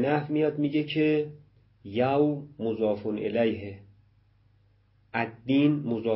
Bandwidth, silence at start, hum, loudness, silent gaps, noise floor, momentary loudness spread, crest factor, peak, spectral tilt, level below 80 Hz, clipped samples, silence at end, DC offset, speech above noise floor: 5.8 kHz; 0 s; none; -27 LUFS; none; -63 dBFS; 10 LU; 16 dB; -12 dBFS; -11 dB/octave; -62 dBFS; under 0.1%; 0 s; under 0.1%; 37 dB